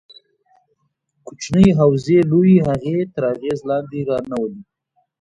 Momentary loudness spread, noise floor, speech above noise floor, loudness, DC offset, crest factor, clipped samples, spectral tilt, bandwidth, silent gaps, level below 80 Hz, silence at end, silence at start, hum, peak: 12 LU; -68 dBFS; 52 dB; -17 LUFS; under 0.1%; 18 dB; under 0.1%; -8 dB/octave; 8.2 kHz; none; -46 dBFS; 0.6 s; 1.25 s; none; 0 dBFS